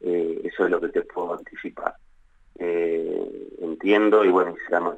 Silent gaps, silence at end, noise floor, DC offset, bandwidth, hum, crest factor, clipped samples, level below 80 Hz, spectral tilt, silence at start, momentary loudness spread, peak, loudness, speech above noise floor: none; 0 s; -55 dBFS; under 0.1%; 7.4 kHz; none; 18 dB; under 0.1%; -60 dBFS; -7 dB/octave; 0 s; 15 LU; -6 dBFS; -24 LUFS; 33 dB